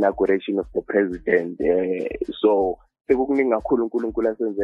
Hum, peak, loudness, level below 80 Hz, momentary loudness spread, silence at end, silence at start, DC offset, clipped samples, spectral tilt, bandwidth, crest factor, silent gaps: none; -4 dBFS; -22 LUFS; -48 dBFS; 6 LU; 0 s; 0 s; under 0.1%; under 0.1%; -8 dB/octave; 5.4 kHz; 18 dB; 3.01-3.05 s